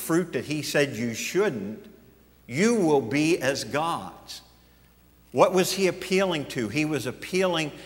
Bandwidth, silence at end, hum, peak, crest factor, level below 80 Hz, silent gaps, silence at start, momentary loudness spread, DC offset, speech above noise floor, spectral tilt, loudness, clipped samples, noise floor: 16 kHz; 0 s; none; -4 dBFS; 22 dB; -60 dBFS; none; 0 s; 13 LU; under 0.1%; 32 dB; -4.5 dB/octave; -25 LUFS; under 0.1%; -57 dBFS